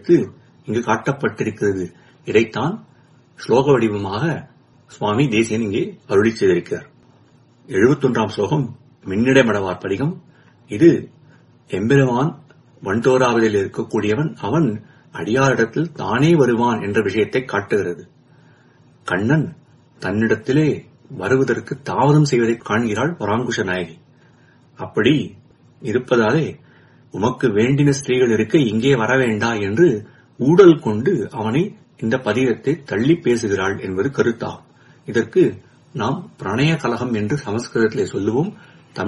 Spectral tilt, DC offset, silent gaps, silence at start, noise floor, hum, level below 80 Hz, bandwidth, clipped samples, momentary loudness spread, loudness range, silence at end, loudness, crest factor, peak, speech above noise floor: -6.5 dB/octave; under 0.1%; none; 0.05 s; -52 dBFS; none; -54 dBFS; 11.5 kHz; under 0.1%; 13 LU; 5 LU; 0 s; -18 LUFS; 18 dB; 0 dBFS; 34 dB